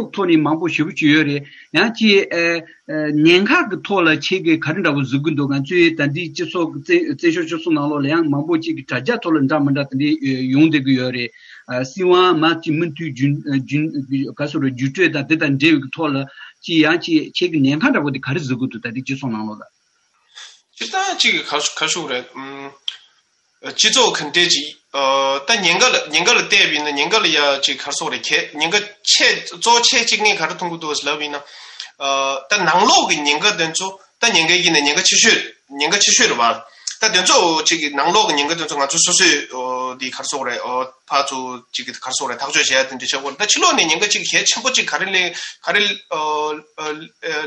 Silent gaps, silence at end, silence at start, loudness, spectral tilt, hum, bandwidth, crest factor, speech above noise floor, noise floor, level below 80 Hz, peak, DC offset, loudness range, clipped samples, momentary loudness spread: none; 0 s; 0 s; -16 LUFS; -2.5 dB/octave; none; 11 kHz; 18 dB; 45 dB; -62 dBFS; -64 dBFS; 0 dBFS; under 0.1%; 6 LU; under 0.1%; 13 LU